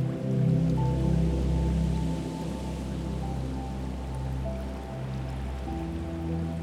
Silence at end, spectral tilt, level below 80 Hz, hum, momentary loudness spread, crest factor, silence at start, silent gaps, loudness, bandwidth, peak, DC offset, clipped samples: 0 s; -8 dB/octave; -34 dBFS; none; 9 LU; 14 dB; 0 s; none; -30 LUFS; 12 kHz; -16 dBFS; under 0.1%; under 0.1%